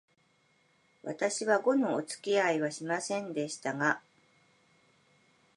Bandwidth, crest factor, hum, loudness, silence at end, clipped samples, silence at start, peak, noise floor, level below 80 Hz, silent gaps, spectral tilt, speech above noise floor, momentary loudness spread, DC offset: 11.5 kHz; 22 dB; none; -31 LUFS; 1.6 s; under 0.1%; 1.05 s; -12 dBFS; -70 dBFS; -86 dBFS; none; -4 dB/octave; 39 dB; 8 LU; under 0.1%